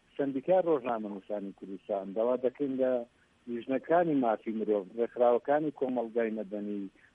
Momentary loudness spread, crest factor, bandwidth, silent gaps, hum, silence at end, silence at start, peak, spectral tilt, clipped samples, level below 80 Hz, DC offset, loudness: 12 LU; 16 dB; 3.8 kHz; none; none; 0.25 s; 0.2 s; -14 dBFS; -9 dB/octave; under 0.1%; -78 dBFS; under 0.1%; -31 LUFS